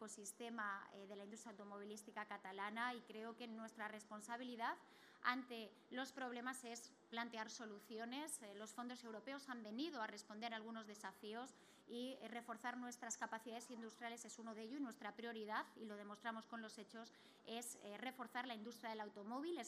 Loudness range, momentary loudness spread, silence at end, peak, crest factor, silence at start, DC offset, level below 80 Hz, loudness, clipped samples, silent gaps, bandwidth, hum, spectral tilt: 3 LU; 8 LU; 0 s; -26 dBFS; 26 dB; 0 s; under 0.1%; under -90 dBFS; -51 LUFS; under 0.1%; none; 15.5 kHz; none; -2.5 dB/octave